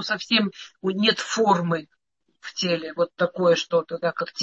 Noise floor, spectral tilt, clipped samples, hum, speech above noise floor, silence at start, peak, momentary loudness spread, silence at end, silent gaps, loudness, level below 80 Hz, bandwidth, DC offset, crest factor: -52 dBFS; -4 dB/octave; under 0.1%; none; 29 dB; 0 s; -6 dBFS; 9 LU; 0 s; none; -23 LUFS; -72 dBFS; 8.2 kHz; under 0.1%; 18 dB